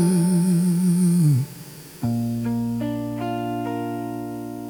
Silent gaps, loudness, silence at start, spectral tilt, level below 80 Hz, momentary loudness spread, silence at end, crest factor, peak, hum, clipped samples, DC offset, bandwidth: none; -23 LUFS; 0 s; -7.5 dB/octave; -56 dBFS; 12 LU; 0 s; 12 dB; -10 dBFS; none; under 0.1%; under 0.1%; over 20 kHz